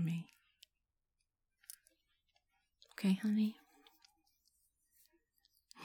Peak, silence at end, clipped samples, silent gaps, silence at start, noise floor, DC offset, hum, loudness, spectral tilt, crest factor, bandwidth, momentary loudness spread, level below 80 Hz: -24 dBFS; 0 s; under 0.1%; none; 0 s; -88 dBFS; under 0.1%; none; -37 LUFS; -6.5 dB/octave; 20 dB; 18.5 kHz; 24 LU; -90 dBFS